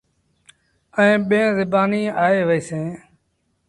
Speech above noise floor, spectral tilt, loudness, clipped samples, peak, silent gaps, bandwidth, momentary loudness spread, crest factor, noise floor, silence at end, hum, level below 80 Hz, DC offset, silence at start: 51 dB; -6.5 dB/octave; -19 LUFS; under 0.1%; -4 dBFS; none; 11.5 kHz; 12 LU; 16 dB; -68 dBFS; 0.7 s; none; -60 dBFS; under 0.1%; 0.95 s